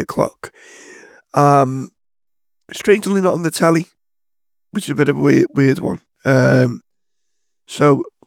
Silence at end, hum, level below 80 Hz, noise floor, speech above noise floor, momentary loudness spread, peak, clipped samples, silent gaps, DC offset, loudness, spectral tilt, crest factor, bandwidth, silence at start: 0.15 s; none; -58 dBFS; -88 dBFS; 73 dB; 20 LU; 0 dBFS; under 0.1%; none; under 0.1%; -16 LUFS; -6.5 dB/octave; 18 dB; 16.5 kHz; 0 s